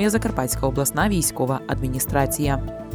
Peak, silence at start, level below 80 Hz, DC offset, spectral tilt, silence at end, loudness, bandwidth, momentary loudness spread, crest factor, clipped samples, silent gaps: -6 dBFS; 0 s; -34 dBFS; under 0.1%; -5 dB/octave; 0 s; -22 LUFS; over 20 kHz; 5 LU; 16 dB; under 0.1%; none